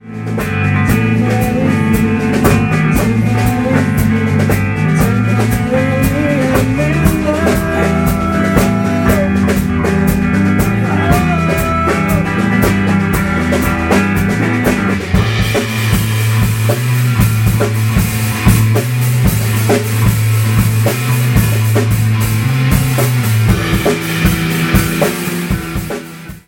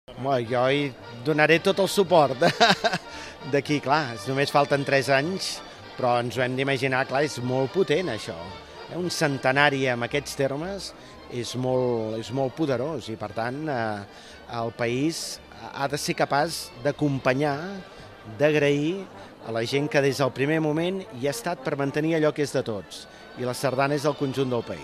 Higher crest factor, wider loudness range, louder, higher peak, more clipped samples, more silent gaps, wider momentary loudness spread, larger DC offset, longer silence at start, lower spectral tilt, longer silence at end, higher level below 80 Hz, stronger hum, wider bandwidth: second, 12 dB vs 24 dB; second, 1 LU vs 6 LU; first, -13 LUFS vs -25 LUFS; about the same, 0 dBFS vs 0 dBFS; neither; neither; second, 2 LU vs 16 LU; neither; about the same, 0.05 s vs 0.1 s; about the same, -6 dB/octave vs -5 dB/octave; about the same, 0.1 s vs 0 s; first, -26 dBFS vs -58 dBFS; neither; first, 17 kHz vs 15 kHz